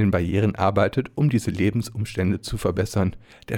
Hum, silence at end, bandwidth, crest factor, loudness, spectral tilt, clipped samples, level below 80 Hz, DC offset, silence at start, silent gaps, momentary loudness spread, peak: none; 0 s; 17 kHz; 14 dB; -23 LUFS; -7 dB/octave; under 0.1%; -44 dBFS; under 0.1%; 0 s; none; 5 LU; -8 dBFS